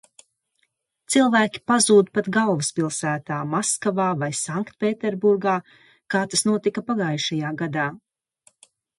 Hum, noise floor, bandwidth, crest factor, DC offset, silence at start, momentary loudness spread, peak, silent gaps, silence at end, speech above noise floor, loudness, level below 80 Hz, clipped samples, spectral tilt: none; -72 dBFS; 11.5 kHz; 18 dB; under 0.1%; 1.1 s; 9 LU; -4 dBFS; none; 1 s; 50 dB; -22 LUFS; -68 dBFS; under 0.1%; -4 dB/octave